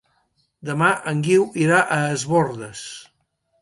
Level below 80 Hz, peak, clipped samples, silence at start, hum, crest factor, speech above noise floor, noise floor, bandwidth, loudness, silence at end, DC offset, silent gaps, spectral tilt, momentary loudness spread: -62 dBFS; -4 dBFS; under 0.1%; 0.65 s; none; 18 dB; 49 dB; -69 dBFS; 11.5 kHz; -19 LUFS; 0.6 s; under 0.1%; none; -5.5 dB/octave; 17 LU